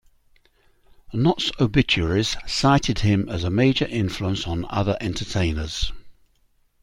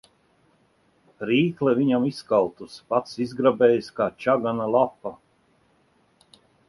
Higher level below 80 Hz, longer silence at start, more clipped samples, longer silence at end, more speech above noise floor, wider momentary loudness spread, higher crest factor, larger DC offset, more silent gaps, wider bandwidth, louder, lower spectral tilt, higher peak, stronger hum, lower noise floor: first, -38 dBFS vs -64 dBFS; about the same, 1.1 s vs 1.2 s; neither; second, 0.7 s vs 1.55 s; about the same, 41 dB vs 41 dB; about the same, 8 LU vs 10 LU; about the same, 20 dB vs 18 dB; neither; neither; about the same, 12.5 kHz vs 11.5 kHz; about the same, -22 LUFS vs -23 LUFS; second, -5.5 dB/octave vs -7 dB/octave; about the same, -4 dBFS vs -6 dBFS; neither; about the same, -62 dBFS vs -64 dBFS